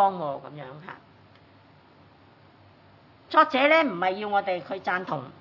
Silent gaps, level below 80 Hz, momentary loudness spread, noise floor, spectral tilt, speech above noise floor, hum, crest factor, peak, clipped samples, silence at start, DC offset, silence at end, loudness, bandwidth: none; -76 dBFS; 22 LU; -55 dBFS; -6.5 dB/octave; 30 dB; none; 22 dB; -6 dBFS; under 0.1%; 0 s; under 0.1%; 0.1 s; -24 LUFS; 6 kHz